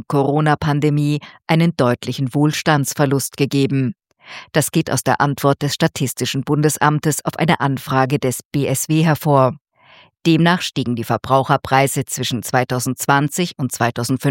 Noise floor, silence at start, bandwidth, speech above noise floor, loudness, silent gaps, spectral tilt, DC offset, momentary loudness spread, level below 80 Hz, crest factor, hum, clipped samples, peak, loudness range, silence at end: -49 dBFS; 0.1 s; 17 kHz; 32 dB; -18 LUFS; 8.45-8.51 s; -5 dB/octave; under 0.1%; 6 LU; -54 dBFS; 18 dB; none; under 0.1%; 0 dBFS; 1 LU; 0 s